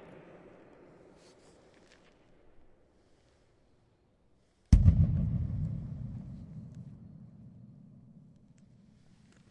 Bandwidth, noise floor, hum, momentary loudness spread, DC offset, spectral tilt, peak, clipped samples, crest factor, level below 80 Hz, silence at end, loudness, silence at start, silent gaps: 9.4 kHz; -69 dBFS; none; 30 LU; under 0.1%; -9 dB/octave; -6 dBFS; under 0.1%; 28 dB; -38 dBFS; 2 s; -30 LUFS; 4.7 s; none